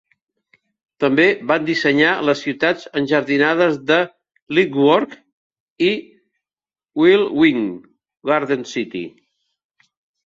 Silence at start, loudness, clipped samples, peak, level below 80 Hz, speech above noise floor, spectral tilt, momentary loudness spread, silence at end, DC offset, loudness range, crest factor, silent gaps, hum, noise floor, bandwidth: 1 s; -17 LUFS; under 0.1%; -2 dBFS; -62 dBFS; over 73 dB; -5.5 dB/octave; 12 LU; 1.15 s; under 0.1%; 3 LU; 18 dB; 4.42-4.47 s, 5.32-5.50 s, 5.60-5.76 s; none; under -90 dBFS; 7.6 kHz